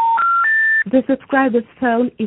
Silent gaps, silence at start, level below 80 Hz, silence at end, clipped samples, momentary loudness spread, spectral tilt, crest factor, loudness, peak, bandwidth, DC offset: none; 0 s; -58 dBFS; 0 s; under 0.1%; 6 LU; -10.5 dB/octave; 14 dB; -15 LUFS; -2 dBFS; 4 kHz; under 0.1%